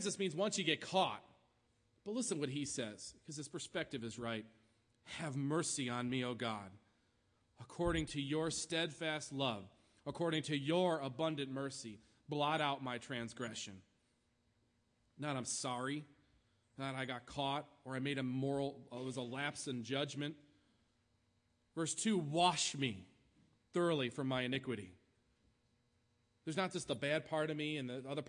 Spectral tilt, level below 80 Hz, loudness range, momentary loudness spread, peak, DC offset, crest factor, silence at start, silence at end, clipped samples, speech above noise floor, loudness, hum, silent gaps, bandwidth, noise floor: -4 dB/octave; -68 dBFS; 5 LU; 12 LU; -20 dBFS; under 0.1%; 22 dB; 0 s; 0 s; under 0.1%; 39 dB; -40 LUFS; none; none; 10.5 kHz; -79 dBFS